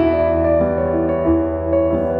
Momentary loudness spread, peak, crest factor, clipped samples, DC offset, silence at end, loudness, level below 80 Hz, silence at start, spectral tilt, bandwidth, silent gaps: 2 LU; -6 dBFS; 10 dB; under 0.1%; under 0.1%; 0 s; -17 LUFS; -32 dBFS; 0 s; -11 dB/octave; 4.7 kHz; none